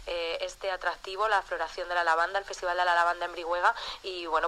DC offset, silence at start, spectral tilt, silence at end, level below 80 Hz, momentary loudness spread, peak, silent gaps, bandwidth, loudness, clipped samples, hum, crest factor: under 0.1%; 0 s; -1.5 dB/octave; 0 s; -56 dBFS; 8 LU; -10 dBFS; none; 14 kHz; -29 LUFS; under 0.1%; none; 18 dB